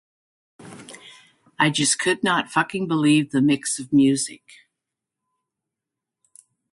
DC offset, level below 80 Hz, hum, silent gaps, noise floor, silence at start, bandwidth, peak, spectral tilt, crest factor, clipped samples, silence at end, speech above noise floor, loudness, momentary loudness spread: under 0.1%; -66 dBFS; none; none; -86 dBFS; 0.6 s; 11.5 kHz; -4 dBFS; -3.5 dB/octave; 20 dB; under 0.1%; 2.35 s; 65 dB; -20 LUFS; 22 LU